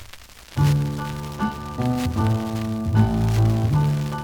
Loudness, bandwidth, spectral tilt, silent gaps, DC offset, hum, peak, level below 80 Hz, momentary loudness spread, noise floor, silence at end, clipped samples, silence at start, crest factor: -22 LUFS; 19 kHz; -7.5 dB/octave; none; under 0.1%; none; -6 dBFS; -36 dBFS; 8 LU; -43 dBFS; 0 s; under 0.1%; 0 s; 16 dB